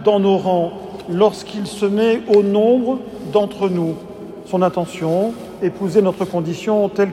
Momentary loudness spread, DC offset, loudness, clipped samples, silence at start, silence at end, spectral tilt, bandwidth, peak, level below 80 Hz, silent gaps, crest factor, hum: 11 LU; under 0.1%; -18 LUFS; under 0.1%; 0 s; 0 s; -7 dB/octave; 13 kHz; -2 dBFS; -54 dBFS; none; 16 dB; none